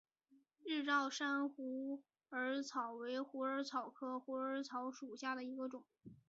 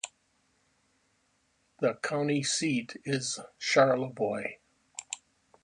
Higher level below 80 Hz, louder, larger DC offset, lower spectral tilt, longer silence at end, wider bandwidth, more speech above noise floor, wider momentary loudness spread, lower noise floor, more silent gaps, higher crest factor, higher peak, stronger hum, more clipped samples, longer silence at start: second, under -90 dBFS vs -74 dBFS; second, -43 LUFS vs -30 LUFS; neither; second, -1 dB/octave vs -4 dB/octave; second, 0.15 s vs 0.5 s; second, 7.6 kHz vs 11 kHz; second, 32 dB vs 43 dB; second, 11 LU vs 17 LU; about the same, -75 dBFS vs -72 dBFS; neither; about the same, 20 dB vs 22 dB; second, -24 dBFS vs -10 dBFS; neither; neither; first, 0.3 s vs 0.05 s